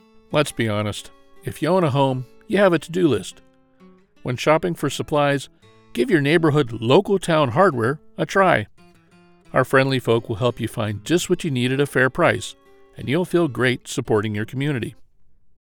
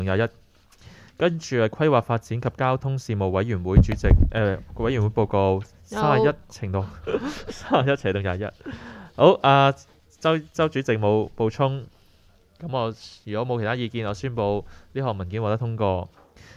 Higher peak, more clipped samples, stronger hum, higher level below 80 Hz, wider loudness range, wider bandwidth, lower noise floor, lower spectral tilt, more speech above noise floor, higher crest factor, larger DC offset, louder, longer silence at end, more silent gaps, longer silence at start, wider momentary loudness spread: about the same, -2 dBFS vs -2 dBFS; neither; neither; second, -52 dBFS vs -34 dBFS; second, 3 LU vs 6 LU; first, 19.5 kHz vs 11 kHz; about the same, -53 dBFS vs -56 dBFS; about the same, -6 dB/octave vs -7 dB/octave; about the same, 33 dB vs 34 dB; about the same, 20 dB vs 22 dB; neither; first, -20 LUFS vs -23 LUFS; about the same, 0.55 s vs 0.5 s; neither; first, 0.3 s vs 0 s; about the same, 11 LU vs 13 LU